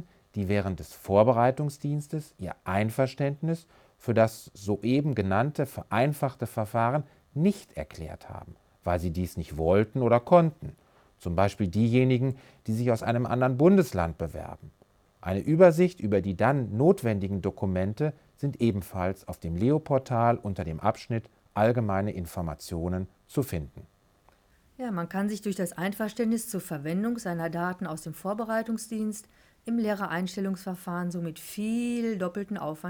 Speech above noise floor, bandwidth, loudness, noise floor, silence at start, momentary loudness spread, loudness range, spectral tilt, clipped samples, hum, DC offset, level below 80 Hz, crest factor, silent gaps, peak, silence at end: 36 dB; over 20 kHz; -28 LUFS; -63 dBFS; 0 s; 14 LU; 7 LU; -7.5 dB/octave; under 0.1%; none; under 0.1%; -56 dBFS; 20 dB; none; -6 dBFS; 0 s